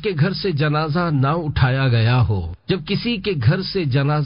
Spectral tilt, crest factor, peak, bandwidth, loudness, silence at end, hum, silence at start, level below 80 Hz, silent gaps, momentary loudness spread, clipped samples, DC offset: -11.5 dB/octave; 14 dB; -4 dBFS; 5.4 kHz; -19 LUFS; 0 s; none; 0 s; -36 dBFS; none; 5 LU; under 0.1%; under 0.1%